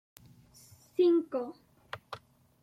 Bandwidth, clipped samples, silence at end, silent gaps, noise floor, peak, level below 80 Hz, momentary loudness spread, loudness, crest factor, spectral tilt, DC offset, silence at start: 15 kHz; under 0.1%; 0.45 s; none; -59 dBFS; -18 dBFS; -76 dBFS; 21 LU; -30 LUFS; 16 dB; -6 dB/octave; under 0.1%; 1 s